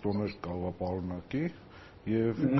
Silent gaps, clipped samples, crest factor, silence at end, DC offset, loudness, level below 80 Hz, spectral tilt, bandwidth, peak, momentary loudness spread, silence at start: none; under 0.1%; 16 dB; 0 s; under 0.1%; -34 LUFS; -58 dBFS; -7.5 dB/octave; 6 kHz; -16 dBFS; 12 LU; 0 s